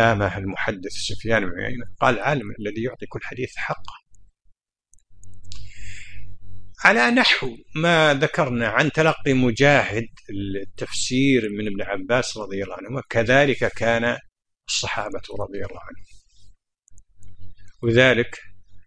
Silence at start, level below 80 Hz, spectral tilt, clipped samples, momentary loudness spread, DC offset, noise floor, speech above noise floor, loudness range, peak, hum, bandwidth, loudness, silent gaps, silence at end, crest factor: 0 s; -46 dBFS; -4.5 dB/octave; under 0.1%; 17 LU; under 0.1%; -59 dBFS; 38 dB; 13 LU; 0 dBFS; none; 10.5 kHz; -21 LUFS; none; 0.05 s; 22 dB